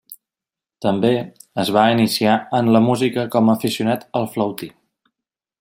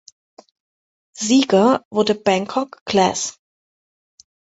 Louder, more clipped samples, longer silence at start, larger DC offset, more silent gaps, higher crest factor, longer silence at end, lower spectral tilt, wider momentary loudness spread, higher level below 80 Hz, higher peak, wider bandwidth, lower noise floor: about the same, -18 LUFS vs -18 LUFS; neither; second, 0.1 s vs 1.15 s; neither; second, none vs 1.85-1.91 s, 2.81-2.86 s; about the same, 18 dB vs 18 dB; second, 0.9 s vs 1.3 s; first, -6 dB/octave vs -4 dB/octave; about the same, 9 LU vs 10 LU; about the same, -62 dBFS vs -60 dBFS; about the same, -2 dBFS vs -2 dBFS; first, 16.5 kHz vs 8.2 kHz; about the same, -88 dBFS vs under -90 dBFS